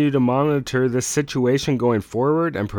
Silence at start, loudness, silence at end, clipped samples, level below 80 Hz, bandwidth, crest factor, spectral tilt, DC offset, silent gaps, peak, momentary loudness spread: 0 s; -20 LUFS; 0 s; under 0.1%; -50 dBFS; 19 kHz; 14 dB; -5.5 dB/octave; under 0.1%; none; -6 dBFS; 3 LU